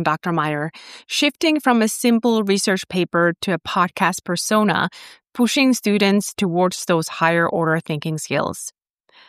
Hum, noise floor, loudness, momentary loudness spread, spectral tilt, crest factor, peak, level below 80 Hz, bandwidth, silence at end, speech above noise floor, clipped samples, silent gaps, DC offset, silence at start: none; -53 dBFS; -19 LUFS; 8 LU; -4.5 dB/octave; 16 dB; -2 dBFS; -62 dBFS; 15.5 kHz; 0.6 s; 34 dB; under 0.1%; none; under 0.1%; 0 s